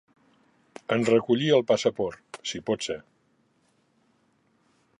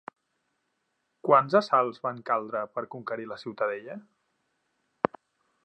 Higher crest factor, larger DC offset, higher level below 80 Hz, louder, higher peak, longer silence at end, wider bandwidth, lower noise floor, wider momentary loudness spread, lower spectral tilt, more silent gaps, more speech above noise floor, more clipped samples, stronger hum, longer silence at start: second, 20 dB vs 26 dB; neither; first, -68 dBFS vs -76 dBFS; about the same, -26 LUFS vs -28 LUFS; second, -8 dBFS vs -4 dBFS; first, 2 s vs 1.65 s; first, 11 kHz vs 8.6 kHz; second, -68 dBFS vs -78 dBFS; about the same, 13 LU vs 15 LU; second, -5 dB/octave vs -6.5 dB/octave; neither; second, 43 dB vs 50 dB; neither; neither; second, 0.9 s vs 1.25 s